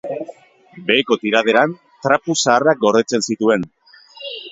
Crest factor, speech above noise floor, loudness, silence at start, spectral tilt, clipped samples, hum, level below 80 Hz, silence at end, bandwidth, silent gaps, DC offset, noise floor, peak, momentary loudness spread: 18 dB; 24 dB; -16 LUFS; 0.05 s; -3.5 dB/octave; under 0.1%; none; -62 dBFS; 0 s; 8 kHz; none; under 0.1%; -41 dBFS; 0 dBFS; 16 LU